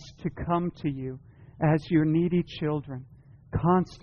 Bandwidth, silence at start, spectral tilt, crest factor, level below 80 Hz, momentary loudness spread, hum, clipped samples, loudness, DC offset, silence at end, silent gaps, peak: 6.8 kHz; 0 s; -7.5 dB/octave; 16 dB; -50 dBFS; 14 LU; none; under 0.1%; -27 LUFS; under 0.1%; 0.05 s; none; -12 dBFS